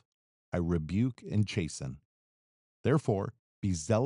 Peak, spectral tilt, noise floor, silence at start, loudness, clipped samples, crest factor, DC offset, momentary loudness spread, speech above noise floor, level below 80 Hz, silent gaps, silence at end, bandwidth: -14 dBFS; -6.5 dB/octave; under -90 dBFS; 0.55 s; -33 LUFS; under 0.1%; 18 dB; under 0.1%; 11 LU; over 60 dB; -54 dBFS; 2.05-2.84 s, 3.39-3.62 s; 0 s; 11 kHz